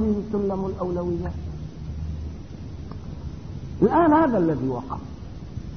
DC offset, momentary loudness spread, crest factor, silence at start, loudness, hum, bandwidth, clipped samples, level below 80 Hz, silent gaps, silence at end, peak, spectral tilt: 0.5%; 19 LU; 18 dB; 0 s; -24 LUFS; none; 6.6 kHz; under 0.1%; -38 dBFS; none; 0 s; -6 dBFS; -9 dB/octave